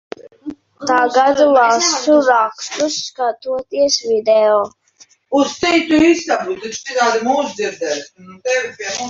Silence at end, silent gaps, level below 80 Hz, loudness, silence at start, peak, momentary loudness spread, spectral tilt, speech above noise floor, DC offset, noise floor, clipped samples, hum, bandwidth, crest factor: 0 s; none; -56 dBFS; -15 LUFS; 0.25 s; -2 dBFS; 13 LU; -2 dB/octave; 35 dB; under 0.1%; -50 dBFS; under 0.1%; none; 7.8 kHz; 14 dB